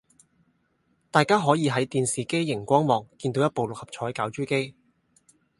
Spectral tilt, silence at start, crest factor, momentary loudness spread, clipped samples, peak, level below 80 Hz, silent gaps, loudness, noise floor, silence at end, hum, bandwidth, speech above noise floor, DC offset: -5 dB/octave; 1.15 s; 24 dB; 10 LU; under 0.1%; -2 dBFS; -64 dBFS; none; -25 LUFS; -69 dBFS; 0.9 s; none; 11.5 kHz; 45 dB; under 0.1%